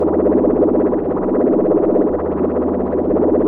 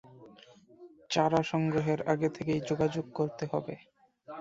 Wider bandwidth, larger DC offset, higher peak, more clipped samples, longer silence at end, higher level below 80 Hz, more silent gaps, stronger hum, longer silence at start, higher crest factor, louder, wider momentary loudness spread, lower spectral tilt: second, 2.9 kHz vs 7.8 kHz; neither; first, -4 dBFS vs -12 dBFS; neither; about the same, 0 s vs 0 s; first, -38 dBFS vs -64 dBFS; neither; neither; about the same, 0 s vs 0.05 s; second, 12 dB vs 20 dB; first, -16 LUFS vs -31 LUFS; second, 4 LU vs 9 LU; first, -13 dB/octave vs -6.5 dB/octave